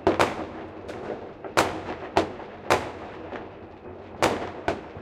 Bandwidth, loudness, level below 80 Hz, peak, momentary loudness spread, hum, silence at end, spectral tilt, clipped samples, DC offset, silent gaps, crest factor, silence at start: 16.5 kHz; -28 LUFS; -52 dBFS; -2 dBFS; 15 LU; none; 0 s; -4.5 dB/octave; under 0.1%; under 0.1%; none; 26 dB; 0 s